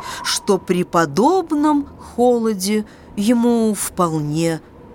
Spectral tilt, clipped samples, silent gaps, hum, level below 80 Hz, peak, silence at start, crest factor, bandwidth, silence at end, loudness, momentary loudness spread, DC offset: -5 dB/octave; under 0.1%; none; none; -50 dBFS; -2 dBFS; 0 s; 16 dB; 19 kHz; 0 s; -18 LUFS; 7 LU; under 0.1%